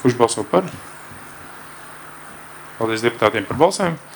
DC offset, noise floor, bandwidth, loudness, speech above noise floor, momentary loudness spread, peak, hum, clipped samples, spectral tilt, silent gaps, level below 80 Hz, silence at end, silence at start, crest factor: under 0.1%; -38 dBFS; over 20 kHz; -19 LUFS; 19 dB; 19 LU; 0 dBFS; none; under 0.1%; -4.5 dB/octave; none; -56 dBFS; 0 s; 0 s; 20 dB